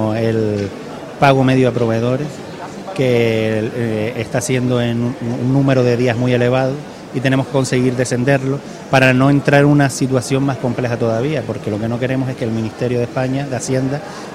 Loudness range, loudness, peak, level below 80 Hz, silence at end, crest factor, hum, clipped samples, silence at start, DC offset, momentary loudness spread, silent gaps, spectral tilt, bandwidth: 4 LU; -16 LUFS; 0 dBFS; -46 dBFS; 0 s; 16 dB; none; under 0.1%; 0 s; under 0.1%; 10 LU; none; -6.5 dB/octave; 13.5 kHz